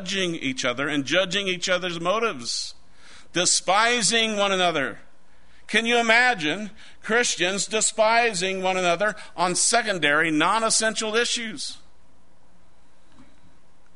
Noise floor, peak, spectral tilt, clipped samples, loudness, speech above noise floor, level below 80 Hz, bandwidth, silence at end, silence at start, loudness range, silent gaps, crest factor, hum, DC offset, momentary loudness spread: -60 dBFS; -4 dBFS; -2 dB/octave; under 0.1%; -22 LUFS; 37 dB; -60 dBFS; 11 kHz; 2.2 s; 0 s; 4 LU; none; 20 dB; none; 1%; 9 LU